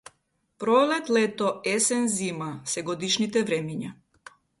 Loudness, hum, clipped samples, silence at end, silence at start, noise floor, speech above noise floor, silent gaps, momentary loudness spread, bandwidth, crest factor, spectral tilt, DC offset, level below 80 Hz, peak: -25 LUFS; none; under 0.1%; 0.65 s; 0.6 s; -72 dBFS; 46 dB; none; 11 LU; 12 kHz; 18 dB; -3.5 dB/octave; under 0.1%; -68 dBFS; -8 dBFS